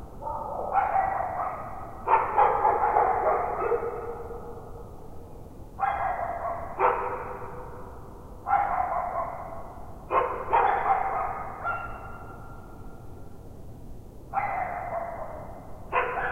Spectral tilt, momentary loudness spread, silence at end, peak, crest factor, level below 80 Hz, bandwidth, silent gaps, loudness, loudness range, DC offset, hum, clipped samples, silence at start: -7 dB/octave; 22 LU; 0 s; -8 dBFS; 20 dB; -46 dBFS; 16 kHz; none; -28 LUFS; 10 LU; under 0.1%; none; under 0.1%; 0 s